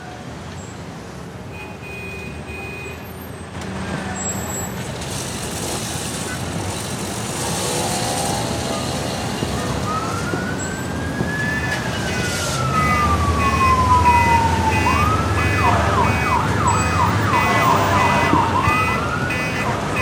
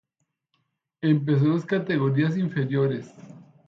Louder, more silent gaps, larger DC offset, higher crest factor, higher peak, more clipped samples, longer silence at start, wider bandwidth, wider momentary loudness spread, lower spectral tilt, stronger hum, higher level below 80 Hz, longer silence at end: first, -19 LUFS vs -24 LUFS; neither; neither; about the same, 18 dB vs 16 dB; first, -2 dBFS vs -10 dBFS; neither; second, 0 s vs 1 s; first, 18.5 kHz vs 7.2 kHz; first, 16 LU vs 7 LU; second, -4.5 dB/octave vs -9 dB/octave; neither; first, -34 dBFS vs -70 dBFS; second, 0 s vs 0.25 s